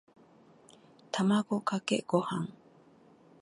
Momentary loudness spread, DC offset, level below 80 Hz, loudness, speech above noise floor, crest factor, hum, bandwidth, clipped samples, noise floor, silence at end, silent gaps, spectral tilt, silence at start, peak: 9 LU; under 0.1%; -78 dBFS; -31 LUFS; 30 dB; 22 dB; none; 11.5 kHz; under 0.1%; -60 dBFS; 0.9 s; none; -5.5 dB/octave; 1.15 s; -12 dBFS